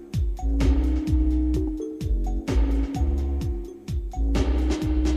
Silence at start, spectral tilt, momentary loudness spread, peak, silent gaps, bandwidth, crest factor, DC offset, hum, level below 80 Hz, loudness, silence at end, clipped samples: 0 s; -7.5 dB/octave; 8 LU; -10 dBFS; none; 9.2 kHz; 12 dB; under 0.1%; none; -24 dBFS; -26 LUFS; 0 s; under 0.1%